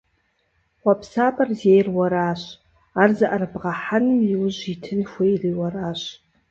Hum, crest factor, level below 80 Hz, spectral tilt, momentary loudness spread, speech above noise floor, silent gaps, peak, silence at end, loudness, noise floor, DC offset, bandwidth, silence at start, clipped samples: none; 20 dB; -58 dBFS; -7 dB/octave; 12 LU; 47 dB; none; -2 dBFS; 0.4 s; -21 LUFS; -68 dBFS; under 0.1%; 7.6 kHz; 0.85 s; under 0.1%